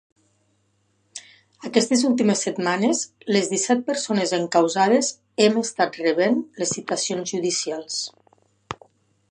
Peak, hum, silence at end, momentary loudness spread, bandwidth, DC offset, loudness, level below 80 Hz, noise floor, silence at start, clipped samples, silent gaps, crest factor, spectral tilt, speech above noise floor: -4 dBFS; none; 0.55 s; 19 LU; 11 kHz; under 0.1%; -22 LUFS; -70 dBFS; -67 dBFS; 1.15 s; under 0.1%; none; 20 dB; -3.5 dB/octave; 45 dB